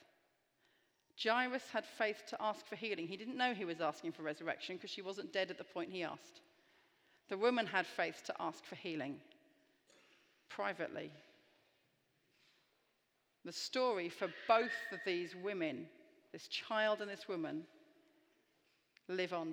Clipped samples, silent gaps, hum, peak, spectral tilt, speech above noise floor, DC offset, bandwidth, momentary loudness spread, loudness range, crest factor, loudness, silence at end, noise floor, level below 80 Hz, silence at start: under 0.1%; none; none; -18 dBFS; -4 dB/octave; 41 dB; under 0.1%; 19.5 kHz; 13 LU; 10 LU; 24 dB; -40 LUFS; 0 s; -81 dBFS; under -90 dBFS; 1.15 s